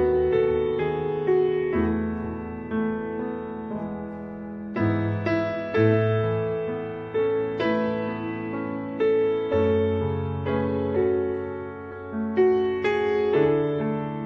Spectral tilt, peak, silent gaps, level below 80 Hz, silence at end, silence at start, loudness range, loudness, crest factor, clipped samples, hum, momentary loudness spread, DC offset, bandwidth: -9.5 dB/octave; -8 dBFS; none; -48 dBFS; 0 s; 0 s; 4 LU; -25 LUFS; 16 dB; under 0.1%; none; 11 LU; under 0.1%; 6 kHz